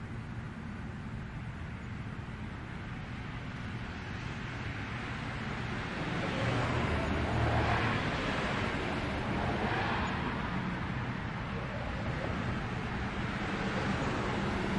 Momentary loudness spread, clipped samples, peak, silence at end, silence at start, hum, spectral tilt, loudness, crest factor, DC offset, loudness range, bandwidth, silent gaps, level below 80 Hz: 10 LU; under 0.1%; -18 dBFS; 0 s; 0 s; none; -6.5 dB/octave; -35 LUFS; 18 dB; under 0.1%; 9 LU; 11 kHz; none; -46 dBFS